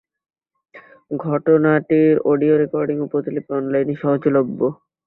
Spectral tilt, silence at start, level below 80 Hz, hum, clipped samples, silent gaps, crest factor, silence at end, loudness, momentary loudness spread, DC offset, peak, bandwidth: -12 dB/octave; 0.75 s; -62 dBFS; none; under 0.1%; none; 16 dB; 0.3 s; -18 LUFS; 8 LU; under 0.1%; -2 dBFS; 4.1 kHz